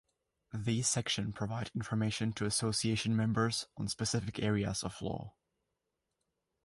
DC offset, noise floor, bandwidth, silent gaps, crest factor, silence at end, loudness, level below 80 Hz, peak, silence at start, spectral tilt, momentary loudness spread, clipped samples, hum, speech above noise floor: under 0.1%; -86 dBFS; 11.5 kHz; none; 18 dB; 1.35 s; -34 LUFS; -60 dBFS; -18 dBFS; 0.55 s; -4.5 dB/octave; 9 LU; under 0.1%; none; 51 dB